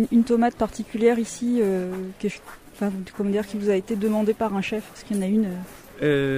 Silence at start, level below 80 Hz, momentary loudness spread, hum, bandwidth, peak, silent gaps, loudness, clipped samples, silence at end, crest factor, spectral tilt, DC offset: 0 s; -52 dBFS; 10 LU; none; 15.5 kHz; -6 dBFS; none; -24 LUFS; under 0.1%; 0 s; 18 dB; -6.5 dB/octave; under 0.1%